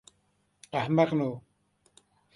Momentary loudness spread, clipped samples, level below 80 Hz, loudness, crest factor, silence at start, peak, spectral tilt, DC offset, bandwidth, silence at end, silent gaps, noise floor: 11 LU; under 0.1%; -70 dBFS; -28 LUFS; 20 dB; 0.75 s; -12 dBFS; -7.5 dB/octave; under 0.1%; 11.5 kHz; 0.95 s; none; -72 dBFS